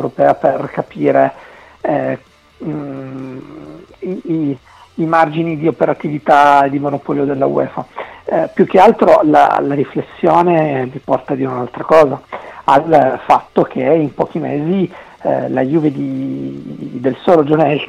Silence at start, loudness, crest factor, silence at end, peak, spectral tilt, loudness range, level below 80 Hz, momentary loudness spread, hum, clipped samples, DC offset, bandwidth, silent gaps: 0 s; -14 LUFS; 14 dB; 0 s; 0 dBFS; -8 dB/octave; 8 LU; -52 dBFS; 17 LU; none; under 0.1%; under 0.1%; 11.5 kHz; none